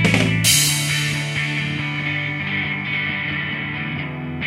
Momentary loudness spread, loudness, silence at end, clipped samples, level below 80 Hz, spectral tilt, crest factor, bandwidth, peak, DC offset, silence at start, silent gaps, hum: 10 LU; -19 LUFS; 0 s; under 0.1%; -46 dBFS; -3 dB/octave; 20 dB; 16 kHz; -2 dBFS; under 0.1%; 0 s; none; none